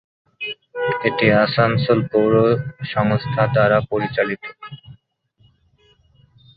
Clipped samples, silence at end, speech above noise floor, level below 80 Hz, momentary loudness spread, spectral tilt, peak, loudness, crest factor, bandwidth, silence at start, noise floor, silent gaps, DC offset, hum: under 0.1%; 1.65 s; 42 dB; -52 dBFS; 14 LU; -10.5 dB/octave; -2 dBFS; -18 LUFS; 18 dB; 5 kHz; 0.4 s; -60 dBFS; none; under 0.1%; none